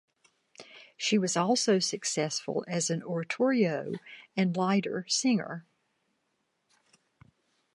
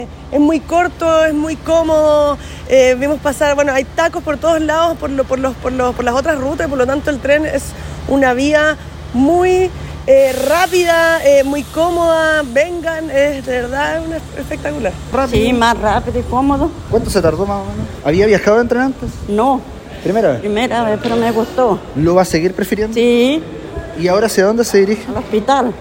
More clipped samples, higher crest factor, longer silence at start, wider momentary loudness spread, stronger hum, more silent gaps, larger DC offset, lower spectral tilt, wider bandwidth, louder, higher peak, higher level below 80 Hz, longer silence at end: neither; about the same, 18 dB vs 14 dB; first, 0.6 s vs 0 s; first, 15 LU vs 9 LU; neither; neither; neither; about the same, -4 dB/octave vs -5 dB/octave; second, 11.5 kHz vs 16.5 kHz; second, -29 LUFS vs -14 LUFS; second, -12 dBFS vs 0 dBFS; second, -80 dBFS vs -34 dBFS; first, 2.15 s vs 0 s